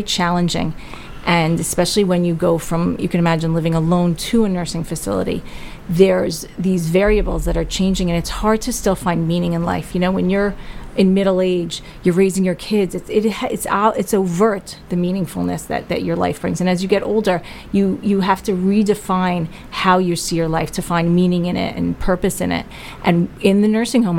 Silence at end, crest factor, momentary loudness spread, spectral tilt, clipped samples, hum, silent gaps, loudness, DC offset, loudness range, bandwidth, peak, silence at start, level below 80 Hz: 0 s; 18 dB; 8 LU; -5.5 dB/octave; under 0.1%; none; none; -18 LUFS; under 0.1%; 2 LU; 16.5 kHz; 0 dBFS; 0 s; -34 dBFS